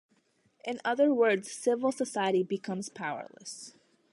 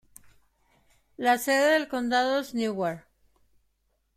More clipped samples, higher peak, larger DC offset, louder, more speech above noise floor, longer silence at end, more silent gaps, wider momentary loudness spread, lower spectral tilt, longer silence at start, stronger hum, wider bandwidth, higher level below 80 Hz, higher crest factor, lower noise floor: neither; second, -14 dBFS vs -10 dBFS; neither; second, -30 LUFS vs -26 LUFS; second, 40 dB vs 48 dB; second, 0.45 s vs 1.15 s; neither; first, 17 LU vs 9 LU; about the same, -4.5 dB/octave vs -3.5 dB/octave; second, 0.65 s vs 1.2 s; neither; second, 11.5 kHz vs 16.5 kHz; second, -82 dBFS vs -68 dBFS; about the same, 16 dB vs 18 dB; about the same, -70 dBFS vs -73 dBFS